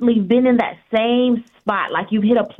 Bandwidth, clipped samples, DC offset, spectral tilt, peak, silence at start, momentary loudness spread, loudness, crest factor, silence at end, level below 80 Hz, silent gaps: 4 kHz; under 0.1%; under 0.1%; -8.5 dB/octave; -4 dBFS; 0 s; 6 LU; -18 LUFS; 12 dB; 0.05 s; -56 dBFS; none